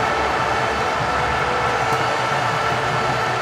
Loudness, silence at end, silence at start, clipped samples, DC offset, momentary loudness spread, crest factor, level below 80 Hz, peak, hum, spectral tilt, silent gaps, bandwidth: -19 LUFS; 0 s; 0 s; under 0.1%; under 0.1%; 1 LU; 12 dB; -40 dBFS; -6 dBFS; none; -4 dB/octave; none; 16 kHz